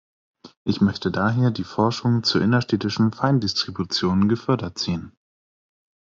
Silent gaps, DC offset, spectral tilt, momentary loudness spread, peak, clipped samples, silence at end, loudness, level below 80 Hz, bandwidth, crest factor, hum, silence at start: 0.57-0.65 s; under 0.1%; -6 dB/octave; 7 LU; -4 dBFS; under 0.1%; 1 s; -22 LUFS; -56 dBFS; 7.6 kHz; 18 dB; none; 0.45 s